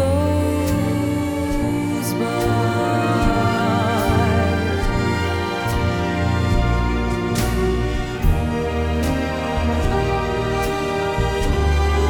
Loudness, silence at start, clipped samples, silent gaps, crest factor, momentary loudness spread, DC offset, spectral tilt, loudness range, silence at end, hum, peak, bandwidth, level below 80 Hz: -20 LUFS; 0 s; under 0.1%; none; 14 dB; 4 LU; under 0.1%; -6.5 dB/octave; 2 LU; 0 s; none; -4 dBFS; 19 kHz; -26 dBFS